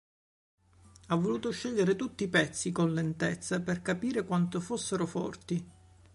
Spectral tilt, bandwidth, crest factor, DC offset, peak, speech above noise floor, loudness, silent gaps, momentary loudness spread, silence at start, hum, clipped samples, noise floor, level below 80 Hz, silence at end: -5.5 dB/octave; 11.5 kHz; 20 dB; under 0.1%; -12 dBFS; 27 dB; -32 LUFS; none; 6 LU; 1.05 s; none; under 0.1%; -58 dBFS; -62 dBFS; 0.45 s